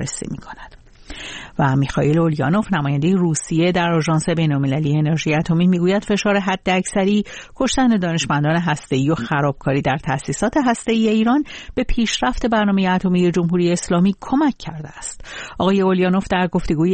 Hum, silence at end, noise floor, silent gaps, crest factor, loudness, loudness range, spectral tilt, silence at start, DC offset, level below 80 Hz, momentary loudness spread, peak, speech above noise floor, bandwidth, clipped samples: none; 0 s; -38 dBFS; none; 14 dB; -18 LUFS; 1 LU; -6 dB/octave; 0 s; under 0.1%; -38 dBFS; 13 LU; -4 dBFS; 20 dB; 8.8 kHz; under 0.1%